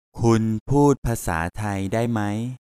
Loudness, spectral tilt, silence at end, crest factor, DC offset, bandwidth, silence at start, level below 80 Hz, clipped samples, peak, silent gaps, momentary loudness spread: -22 LUFS; -7 dB/octave; 0.1 s; 16 dB; under 0.1%; 15 kHz; 0.15 s; -40 dBFS; under 0.1%; -4 dBFS; 0.61-0.66 s, 0.98-1.02 s; 8 LU